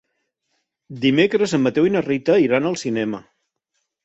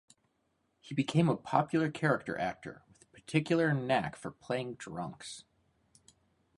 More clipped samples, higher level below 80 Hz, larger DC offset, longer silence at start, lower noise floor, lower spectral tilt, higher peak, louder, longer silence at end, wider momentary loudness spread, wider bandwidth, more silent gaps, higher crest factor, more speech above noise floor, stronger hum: neither; first, -60 dBFS vs -68 dBFS; neither; about the same, 0.9 s vs 0.85 s; about the same, -75 dBFS vs -77 dBFS; about the same, -5.5 dB/octave vs -6.5 dB/octave; first, -4 dBFS vs -12 dBFS; first, -19 LUFS vs -33 LUFS; second, 0.85 s vs 1.15 s; second, 9 LU vs 17 LU; second, 8.2 kHz vs 11.5 kHz; neither; about the same, 18 dB vs 22 dB; first, 56 dB vs 45 dB; neither